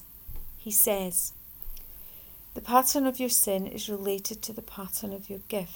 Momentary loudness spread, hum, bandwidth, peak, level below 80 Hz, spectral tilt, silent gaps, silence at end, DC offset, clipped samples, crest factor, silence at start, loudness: 21 LU; none; over 20 kHz; -6 dBFS; -50 dBFS; -2.5 dB/octave; none; 0 s; under 0.1%; under 0.1%; 24 dB; 0 s; -26 LUFS